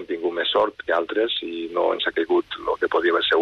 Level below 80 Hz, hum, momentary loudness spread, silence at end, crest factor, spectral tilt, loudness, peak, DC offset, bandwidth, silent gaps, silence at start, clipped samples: -60 dBFS; none; 6 LU; 0 s; 14 dB; -4.5 dB/octave; -23 LUFS; -10 dBFS; under 0.1%; 6.4 kHz; none; 0 s; under 0.1%